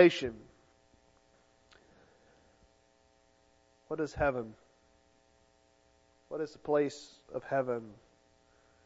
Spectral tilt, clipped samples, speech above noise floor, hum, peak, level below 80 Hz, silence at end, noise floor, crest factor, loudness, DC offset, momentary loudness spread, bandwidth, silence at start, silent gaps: -4.5 dB/octave; under 0.1%; 37 dB; none; -8 dBFS; -60 dBFS; 0.95 s; -68 dBFS; 28 dB; -34 LUFS; under 0.1%; 16 LU; 7.6 kHz; 0 s; none